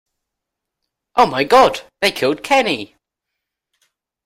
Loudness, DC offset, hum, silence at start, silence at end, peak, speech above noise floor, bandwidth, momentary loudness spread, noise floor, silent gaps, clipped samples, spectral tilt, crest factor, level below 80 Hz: -16 LUFS; under 0.1%; none; 1.15 s; 1.4 s; -2 dBFS; 66 dB; 16 kHz; 10 LU; -81 dBFS; none; under 0.1%; -3.5 dB/octave; 18 dB; -54 dBFS